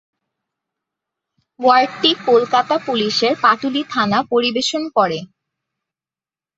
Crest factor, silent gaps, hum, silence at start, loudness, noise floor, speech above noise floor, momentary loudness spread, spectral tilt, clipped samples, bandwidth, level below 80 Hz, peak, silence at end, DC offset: 18 dB; none; none; 1.6 s; -16 LUFS; under -90 dBFS; over 74 dB; 5 LU; -3.5 dB/octave; under 0.1%; 8 kHz; -64 dBFS; 0 dBFS; 1.3 s; under 0.1%